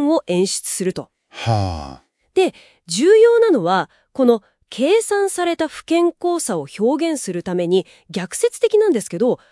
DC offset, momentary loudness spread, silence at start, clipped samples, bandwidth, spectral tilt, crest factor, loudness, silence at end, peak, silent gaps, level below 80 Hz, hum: under 0.1%; 12 LU; 0 s; under 0.1%; 12 kHz; -5 dB/octave; 16 dB; -18 LUFS; 0.15 s; -2 dBFS; none; -52 dBFS; none